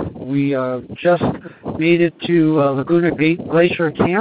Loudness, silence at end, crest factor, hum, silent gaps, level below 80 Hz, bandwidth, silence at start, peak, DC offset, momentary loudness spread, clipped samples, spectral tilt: -17 LUFS; 0 s; 16 dB; none; none; -50 dBFS; 4.9 kHz; 0 s; 0 dBFS; under 0.1%; 7 LU; under 0.1%; -12 dB/octave